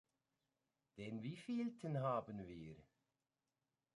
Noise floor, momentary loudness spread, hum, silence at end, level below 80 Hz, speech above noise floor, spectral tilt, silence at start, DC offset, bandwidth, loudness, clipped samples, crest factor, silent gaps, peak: under -90 dBFS; 17 LU; none; 1.15 s; -78 dBFS; over 44 dB; -8 dB/octave; 0.95 s; under 0.1%; 11 kHz; -46 LUFS; under 0.1%; 20 dB; none; -30 dBFS